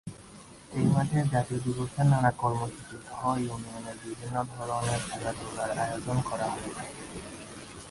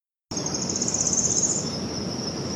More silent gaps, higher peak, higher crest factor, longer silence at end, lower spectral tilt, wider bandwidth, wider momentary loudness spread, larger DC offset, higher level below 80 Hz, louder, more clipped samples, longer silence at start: neither; second, -12 dBFS vs -8 dBFS; about the same, 18 dB vs 18 dB; about the same, 0 s vs 0 s; first, -6 dB/octave vs -2.5 dB/octave; second, 11.5 kHz vs 15 kHz; first, 17 LU vs 9 LU; neither; about the same, -54 dBFS vs -52 dBFS; second, -30 LUFS vs -24 LUFS; neither; second, 0.05 s vs 0.3 s